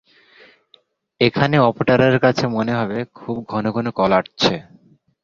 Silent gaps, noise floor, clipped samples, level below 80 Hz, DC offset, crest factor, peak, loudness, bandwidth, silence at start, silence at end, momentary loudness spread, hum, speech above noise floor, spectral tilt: none; -57 dBFS; under 0.1%; -52 dBFS; under 0.1%; 18 dB; 0 dBFS; -18 LUFS; 7.4 kHz; 1.2 s; 0.65 s; 11 LU; none; 39 dB; -6.5 dB/octave